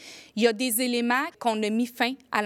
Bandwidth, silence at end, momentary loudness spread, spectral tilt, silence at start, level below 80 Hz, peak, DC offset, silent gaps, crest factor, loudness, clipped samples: 17 kHz; 0 s; 4 LU; -3 dB/octave; 0 s; -78 dBFS; -8 dBFS; under 0.1%; none; 18 dB; -25 LUFS; under 0.1%